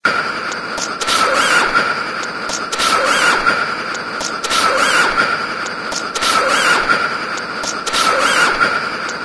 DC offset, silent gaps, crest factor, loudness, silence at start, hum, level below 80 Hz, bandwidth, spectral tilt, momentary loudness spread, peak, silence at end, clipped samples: under 0.1%; none; 16 dB; -15 LUFS; 0.05 s; none; -46 dBFS; 11 kHz; -1 dB/octave; 9 LU; 0 dBFS; 0 s; under 0.1%